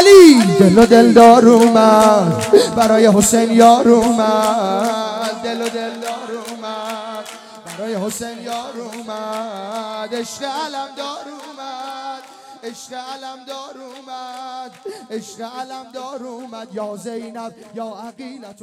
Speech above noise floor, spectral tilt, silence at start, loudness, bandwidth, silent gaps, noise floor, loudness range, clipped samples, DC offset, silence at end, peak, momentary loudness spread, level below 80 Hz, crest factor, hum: 23 dB; -5 dB/octave; 0 s; -12 LUFS; 16.5 kHz; none; -38 dBFS; 21 LU; 0.7%; under 0.1%; 0.1 s; 0 dBFS; 24 LU; -52 dBFS; 14 dB; none